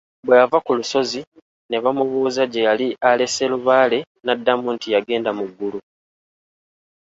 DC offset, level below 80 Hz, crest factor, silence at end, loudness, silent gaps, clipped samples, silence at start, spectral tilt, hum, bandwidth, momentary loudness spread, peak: under 0.1%; -66 dBFS; 18 dB; 1.2 s; -19 LUFS; 1.27-1.32 s, 1.42-1.69 s, 4.07-4.15 s; under 0.1%; 0.25 s; -3.5 dB/octave; none; 8 kHz; 11 LU; -2 dBFS